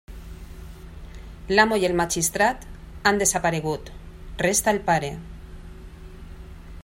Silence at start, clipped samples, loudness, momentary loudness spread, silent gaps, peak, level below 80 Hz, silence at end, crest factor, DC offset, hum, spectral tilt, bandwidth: 0.1 s; under 0.1%; -22 LUFS; 24 LU; none; -4 dBFS; -42 dBFS; 0 s; 22 dB; under 0.1%; none; -3 dB/octave; 16 kHz